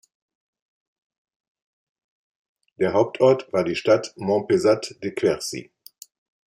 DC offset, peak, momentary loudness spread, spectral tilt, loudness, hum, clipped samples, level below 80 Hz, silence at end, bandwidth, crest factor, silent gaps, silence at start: under 0.1%; -6 dBFS; 9 LU; -5.5 dB/octave; -22 LUFS; none; under 0.1%; -64 dBFS; 0.9 s; 14 kHz; 20 dB; none; 2.8 s